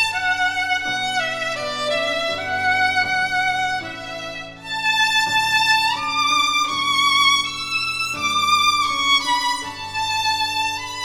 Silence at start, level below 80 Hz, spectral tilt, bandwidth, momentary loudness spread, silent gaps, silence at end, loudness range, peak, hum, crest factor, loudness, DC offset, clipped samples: 0 s; -52 dBFS; -0.5 dB/octave; over 20 kHz; 8 LU; none; 0 s; 4 LU; -4 dBFS; none; 16 dB; -18 LUFS; under 0.1%; under 0.1%